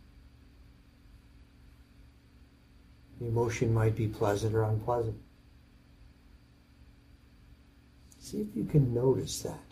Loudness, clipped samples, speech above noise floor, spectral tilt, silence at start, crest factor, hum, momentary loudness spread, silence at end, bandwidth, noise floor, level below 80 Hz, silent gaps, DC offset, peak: -31 LUFS; under 0.1%; 29 dB; -7 dB/octave; 0.15 s; 20 dB; none; 12 LU; 0.1 s; 15 kHz; -59 dBFS; -54 dBFS; none; under 0.1%; -14 dBFS